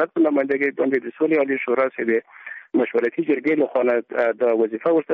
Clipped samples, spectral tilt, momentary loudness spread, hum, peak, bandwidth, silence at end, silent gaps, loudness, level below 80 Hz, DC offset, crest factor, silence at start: under 0.1%; -5 dB/octave; 4 LU; none; -8 dBFS; 4.7 kHz; 0 s; none; -21 LUFS; -70 dBFS; under 0.1%; 12 dB; 0 s